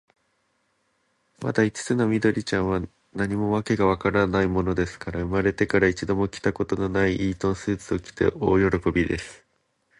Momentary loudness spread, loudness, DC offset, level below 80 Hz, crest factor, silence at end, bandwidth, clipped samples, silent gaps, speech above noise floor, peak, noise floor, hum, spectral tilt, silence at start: 8 LU; -24 LUFS; under 0.1%; -44 dBFS; 18 dB; 0.65 s; 11 kHz; under 0.1%; none; 47 dB; -6 dBFS; -70 dBFS; none; -6.5 dB/octave; 1.4 s